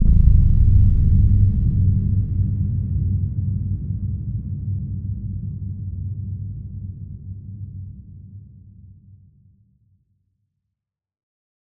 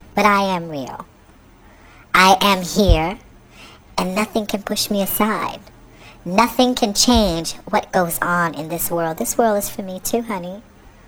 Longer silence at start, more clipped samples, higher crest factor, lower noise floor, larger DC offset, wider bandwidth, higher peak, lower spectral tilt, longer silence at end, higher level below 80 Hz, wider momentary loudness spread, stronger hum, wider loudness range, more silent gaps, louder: second, 0 s vs 0.15 s; neither; about the same, 20 dB vs 20 dB; first, -83 dBFS vs -48 dBFS; neither; second, 0.7 kHz vs over 20 kHz; about the same, 0 dBFS vs 0 dBFS; first, -13 dB/octave vs -3.5 dB/octave; first, 2.6 s vs 0.2 s; first, -24 dBFS vs -32 dBFS; first, 20 LU vs 14 LU; neither; first, 21 LU vs 3 LU; neither; second, -21 LUFS vs -18 LUFS